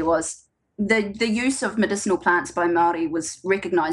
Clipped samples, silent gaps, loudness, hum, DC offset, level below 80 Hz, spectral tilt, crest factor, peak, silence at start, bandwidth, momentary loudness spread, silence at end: under 0.1%; none; -22 LUFS; none; under 0.1%; -54 dBFS; -4 dB/octave; 18 dB; -4 dBFS; 0 s; 12 kHz; 7 LU; 0 s